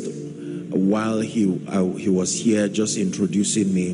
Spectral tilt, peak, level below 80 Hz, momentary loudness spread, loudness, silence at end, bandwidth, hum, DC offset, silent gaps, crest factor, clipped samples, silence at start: -5 dB/octave; -8 dBFS; -56 dBFS; 9 LU; -21 LUFS; 0 s; 10.5 kHz; none; under 0.1%; none; 12 dB; under 0.1%; 0 s